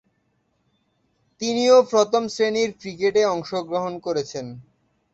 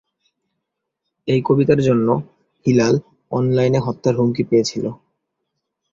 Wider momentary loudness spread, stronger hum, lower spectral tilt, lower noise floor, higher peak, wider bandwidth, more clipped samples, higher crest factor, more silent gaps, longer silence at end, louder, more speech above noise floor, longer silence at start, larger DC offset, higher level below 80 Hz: first, 13 LU vs 9 LU; neither; second, -4 dB/octave vs -7 dB/octave; second, -69 dBFS vs -78 dBFS; about the same, -4 dBFS vs -2 dBFS; about the same, 8 kHz vs 7.6 kHz; neither; about the same, 18 dB vs 18 dB; neither; second, 0.5 s vs 1 s; second, -21 LUFS vs -18 LUFS; second, 48 dB vs 62 dB; first, 1.4 s vs 1.25 s; neither; second, -66 dBFS vs -54 dBFS